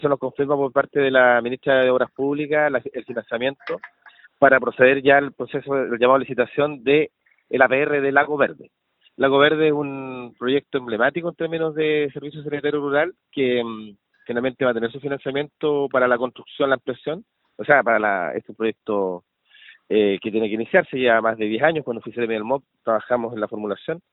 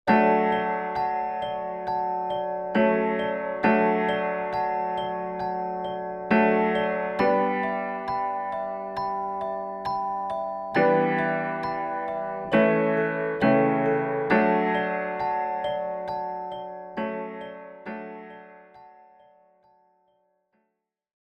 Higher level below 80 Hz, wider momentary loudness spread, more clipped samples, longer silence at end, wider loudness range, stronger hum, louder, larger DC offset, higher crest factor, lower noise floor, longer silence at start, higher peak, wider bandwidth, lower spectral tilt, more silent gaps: about the same, -64 dBFS vs -60 dBFS; about the same, 12 LU vs 11 LU; neither; second, 0.15 s vs 2.45 s; second, 5 LU vs 12 LU; neither; first, -21 LUFS vs -26 LUFS; neither; about the same, 20 dB vs 18 dB; second, -50 dBFS vs -79 dBFS; about the same, 0 s vs 0.05 s; first, 0 dBFS vs -8 dBFS; second, 4.1 kHz vs 6 kHz; first, -9.5 dB/octave vs -8 dB/octave; neither